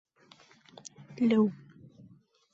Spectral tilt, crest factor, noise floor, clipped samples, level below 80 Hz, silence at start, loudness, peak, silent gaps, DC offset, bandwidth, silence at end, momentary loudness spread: -6.5 dB/octave; 18 dB; -60 dBFS; under 0.1%; -76 dBFS; 1.1 s; -28 LUFS; -16 dBFS; none; under 0.1%; 7.8 kHz; 1 s; 24 LU